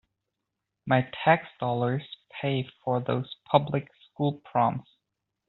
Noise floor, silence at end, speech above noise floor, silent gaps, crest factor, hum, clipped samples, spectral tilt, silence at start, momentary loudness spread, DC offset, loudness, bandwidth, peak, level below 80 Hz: -84 dBFS; 0.7 s; 57 dB; none; 24 dB; none; under 0.1%; -5 dB/octave; 0.85 s; 10 LU; under 0.1%; -28 LUFS; 4.2 kHz; -4 dBFS; -66 dBFS